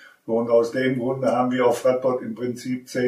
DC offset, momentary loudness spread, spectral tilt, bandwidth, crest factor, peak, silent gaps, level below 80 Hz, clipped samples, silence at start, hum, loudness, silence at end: under 0.1%; 9 LU; -6 dB/octave; 15 kHz; 16 dB; -6 dBFS; none; -68 dBFS; under 0.1%; 0.05 s; none; -22 LUFS; 0 s